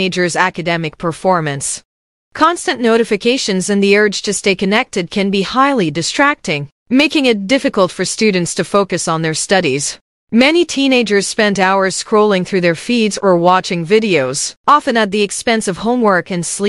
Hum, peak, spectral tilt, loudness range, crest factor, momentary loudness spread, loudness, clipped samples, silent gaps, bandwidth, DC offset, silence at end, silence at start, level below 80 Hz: none; 0 dBFS; -4 dB/octave; 2 LU; 14 dB; 7 LU; -14 LUFS; under 0.1%; 1.85-2.31 s, 6.72-6.86 s, 10.01-10.27 s, 14.57-14.64 s; 12 kHz; 0.2%; 0 s; 0 s; -52 dBFS